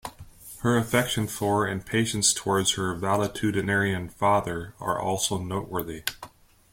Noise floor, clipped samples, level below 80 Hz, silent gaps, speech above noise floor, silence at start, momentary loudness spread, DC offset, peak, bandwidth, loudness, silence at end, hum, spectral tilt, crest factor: -48 dBFS; under 0.1%; -52 dBFS; none; 22 dB; 0.05 s; 10 LU; under 0.1%; -6 dBFS; 16.5 kHz; -26 LUFS; 0.45 s; none; -3.5 dB/octave; 22 dB